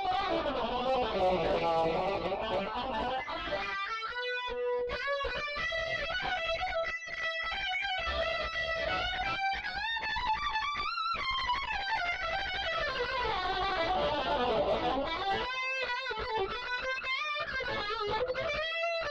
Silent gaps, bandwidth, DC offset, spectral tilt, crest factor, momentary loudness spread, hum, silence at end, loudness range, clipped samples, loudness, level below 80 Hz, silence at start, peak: none; 9 kHz; under 0.1%; -4 dB/octave; 12 dB; 4 LU; none; 0 s; 2 LU; under 0.1%; -32 LUFS; -50 dBFS; 0 s; -22 dBFS